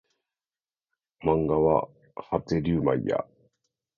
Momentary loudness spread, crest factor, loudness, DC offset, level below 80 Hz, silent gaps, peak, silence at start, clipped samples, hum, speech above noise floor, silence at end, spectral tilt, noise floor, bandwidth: 15 LU; 20 dB; -26 LUFS; under 0.1%; -50 dBFS; none; -8 dBFS; 1.2 s; under 0.1%; none; over 65 dB; 0.75 s; -9 dB/octave; under -90 dBFS; 7.2 kHz